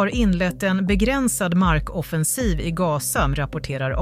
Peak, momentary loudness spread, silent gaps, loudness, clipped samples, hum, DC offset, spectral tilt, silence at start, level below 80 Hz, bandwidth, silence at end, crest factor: -6 dBFS; 6 LU; none; -21 LUFS; under 0.1%; none; under 0.1%; -5 dB/octave; 0 s; -30 dBFS; 16 kHz; 0 s; 16 dB